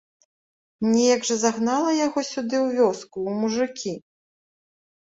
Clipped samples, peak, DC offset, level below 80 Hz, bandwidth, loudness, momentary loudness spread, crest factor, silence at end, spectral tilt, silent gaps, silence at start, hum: under 0.1%; -6 dBFS; under 0.1%; -68 dBFS; 8 kHz; -23 LUFS; 10 LU; 18 dB; 1.05 s; -4 dB/octave; none; 0.8 s; none